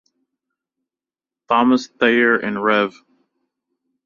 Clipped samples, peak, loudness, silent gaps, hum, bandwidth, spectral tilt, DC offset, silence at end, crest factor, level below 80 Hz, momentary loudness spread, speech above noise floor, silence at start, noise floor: under 0.1%; -2 dBFS; -17 LUFS; none; none; 7.2 kHz; -5 dB/octave; under 0.1%; 1.15 s; 18 dB; -64 dBFS; 5 LU; 73 dB; 1.5 s; -90 dBFS